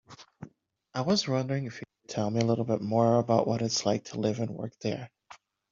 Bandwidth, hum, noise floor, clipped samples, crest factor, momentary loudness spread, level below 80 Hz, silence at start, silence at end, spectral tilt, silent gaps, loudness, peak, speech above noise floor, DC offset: 7.6 kHz; none; -59 dBFS; under 0.1%; 22 dB; 21 LU; -68 dBFS; 0.1 s; 0.35 s; -6 dB/octave; none; -29 LUFS; -8 dBFS; 31 dB; under 0.1%